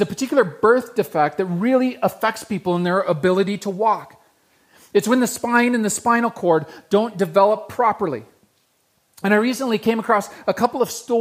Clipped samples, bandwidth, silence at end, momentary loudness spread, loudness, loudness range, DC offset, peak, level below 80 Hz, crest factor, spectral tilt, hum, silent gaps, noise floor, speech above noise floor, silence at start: under 0.1%; 15.5 kHz; 0 s; 6 LU; -20 LUFS; 3 LU; under 0.1%; -2 dBFS; -64 dBFS; 18 dB; -5 dB/octave; none; none; -64 dBFS; 45 dB; 0 s